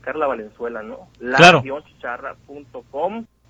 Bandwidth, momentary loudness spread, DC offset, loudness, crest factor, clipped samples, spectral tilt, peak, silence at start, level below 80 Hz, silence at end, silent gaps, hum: 11 kHz; 24 LU; under 0.1%; -15 LUFS; 18 dB; under 0.1%; -4 dB/octave; 0 dBFS; 0.05 s; -52 dBFS; 0.25 s; none; none